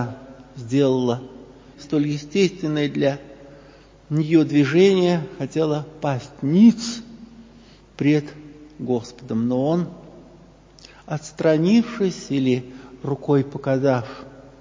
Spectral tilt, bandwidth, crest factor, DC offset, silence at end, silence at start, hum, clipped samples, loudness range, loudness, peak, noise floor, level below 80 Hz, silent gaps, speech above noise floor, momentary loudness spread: -7 dB/octave; 7.6 kHz; 18 dB; under 0.1%; 0.2 s; 0 s; none; under 0.1%; 6 LU; -21 LUFS; -4 dBFS; -48 dBFS; -56 dBFS; none; 28 dB; 18 LU